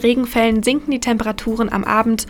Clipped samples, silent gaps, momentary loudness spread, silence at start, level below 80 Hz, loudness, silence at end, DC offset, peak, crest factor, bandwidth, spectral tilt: under 0.1%; none; 5 LU; 0 s; -38 dBFS; -18 LUFS; 0 s; under 0.1%; -2 dBFS; 14 dB; 18 kHz; -4.5 dB/octave